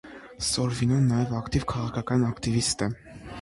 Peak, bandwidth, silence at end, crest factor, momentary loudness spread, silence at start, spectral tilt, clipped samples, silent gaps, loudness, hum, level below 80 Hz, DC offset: -10 dBFS; 11.5 kHz; 0 s; 16 dB; 9 LU; 0.05 s; -5 dB/octave; under 0.1%; none; -26 LUFS; none; -46 dBFS; under 0.1%